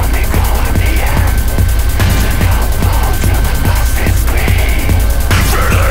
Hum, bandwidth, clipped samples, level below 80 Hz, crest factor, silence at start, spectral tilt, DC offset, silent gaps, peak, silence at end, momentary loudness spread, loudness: none; 16.5 kHz; under 0.1%; -12 dBFS; 8 dB; 0 s; -5 dB/octave; under 0.1%; none; -2 dBFS; 0 s; 2 LU; -13 LUFS